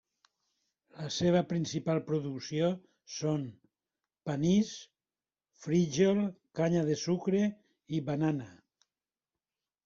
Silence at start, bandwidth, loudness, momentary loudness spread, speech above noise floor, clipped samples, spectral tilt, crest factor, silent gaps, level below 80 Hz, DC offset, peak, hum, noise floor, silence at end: 0.95 s; 7.6 kHz; -32 LUFS; 15 LU; over 60 dB; under 0.1%; -6 dB/octave; 18 dB; none; -68 dBFS; under 0.1%; -14 dBFS; none; under -90 dBFS; 1.3 s